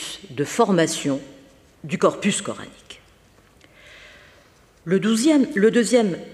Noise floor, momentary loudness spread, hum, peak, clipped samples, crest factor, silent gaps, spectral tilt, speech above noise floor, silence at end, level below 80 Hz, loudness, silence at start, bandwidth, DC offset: -54 dBFS; 16 LU; none; -4 dBFS; under 0.1%; 20 dB; none; -4.5 dB/octave; 34 dB; 0 s; -62 dBFS; -20 LUFS; 0 s; 14.5 kHz; under 0.1%